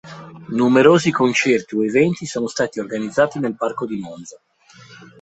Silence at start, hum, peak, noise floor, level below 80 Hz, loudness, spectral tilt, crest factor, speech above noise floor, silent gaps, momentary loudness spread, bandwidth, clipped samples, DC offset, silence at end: 0.05 s; none; -2 dBFS; -45 dBFS; -60 dBFS; -18 LUFS; -5.5 dB/octave; 18 dB; 28 dB; none; 16 LU; 8.4 kHz; under 0.1%; under 0.1%; 0.15 s